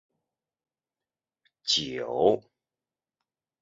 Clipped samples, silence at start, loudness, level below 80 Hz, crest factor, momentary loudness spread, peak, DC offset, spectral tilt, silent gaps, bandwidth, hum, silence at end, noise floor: under 0.1%; 1.65 s; -27 LUFS; -66 dBFS; 24 dB; 8 LU; -8 dBFS; under 0.1%; -2 dB/octave; none; 7.6 kHz; none; 1.25 s; under -90 dBFS